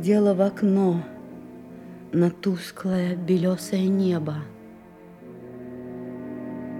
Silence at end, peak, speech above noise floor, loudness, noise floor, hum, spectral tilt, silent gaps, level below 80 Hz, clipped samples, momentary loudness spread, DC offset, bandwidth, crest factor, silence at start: 0 s; -8 dBFS; 24 dB; -24 LUFS; -46 dBFS; none; -7.5 dB/octave; none; -64 dBFS; under 0.1%; 21 LU; under 0.1%; 14 kHz; 16 dB; 0 s